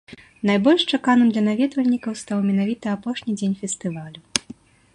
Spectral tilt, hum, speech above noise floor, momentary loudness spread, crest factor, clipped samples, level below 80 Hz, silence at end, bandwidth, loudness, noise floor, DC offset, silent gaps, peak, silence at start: -4.5 dB/octave; none; 23 dB; 10 LU; 20 dB; under 0.1%; -62 dBFS; 0.55 s; 11.5 kHz; -21 LUFS; -44 dBFS; under 0.1%; none; 0 dBFS; 0.1 s